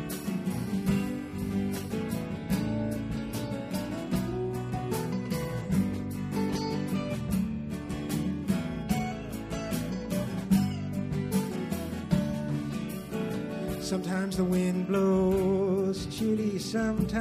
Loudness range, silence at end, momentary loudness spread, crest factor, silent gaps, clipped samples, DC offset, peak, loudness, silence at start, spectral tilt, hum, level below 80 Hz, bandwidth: 4 LU; 0 s; 7 LU; 16 dB; none; under 0.1%; under 0.1%; -14 dBFS; -31 LUFS; 0 s; -6.5 dB/octave; none; -48 dBFS; 15.5 kHz